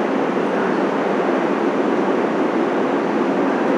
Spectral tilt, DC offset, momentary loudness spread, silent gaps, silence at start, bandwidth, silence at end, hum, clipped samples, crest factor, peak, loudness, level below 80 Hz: -6.5 dB/octave; under 0.1%; 1 LU; none; 0 s; 10.5 kHz; 0 s; none; under 0.1%; 12 dB; -6 dBFS; -19 LUFS; -80 dBFS